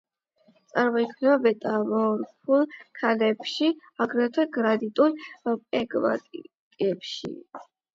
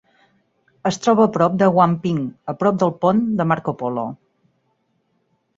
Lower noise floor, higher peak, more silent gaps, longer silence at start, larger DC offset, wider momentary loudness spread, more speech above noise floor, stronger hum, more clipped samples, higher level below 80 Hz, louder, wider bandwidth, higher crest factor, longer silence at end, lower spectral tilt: about the same, -64 dBFS vs -67 dBFS; second, -8 dBFS vs -2 dBFS; first, 6.59-6.71 s vs none; about the same, 0.75 s vs 0.85 s; neither; about the same, 11 LU vs 10 LU; second, 39 dB vs 49 dB; neither; neither; second, -74 dBFS vs -60 dBFS; second, -25 LUFS vs -19 LUFS; about the same, 7.8 kHz vs 7.8 kHz; about the same, 18 dB vs 18 dB; second, 0.3 s vs 1.4 s; about the same, -6 dB/octave vs -7 dB/octave